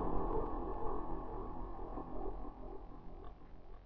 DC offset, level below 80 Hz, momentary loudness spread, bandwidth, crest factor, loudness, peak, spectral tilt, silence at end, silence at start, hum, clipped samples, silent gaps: under 0.1%; -46 dBFS; 15 LU; 3.8 kHz; 16 dB; -45 LUFS; -24 dBFS; -8.5 dB/octave; 0 s; 0 s; none; under 0.1%; none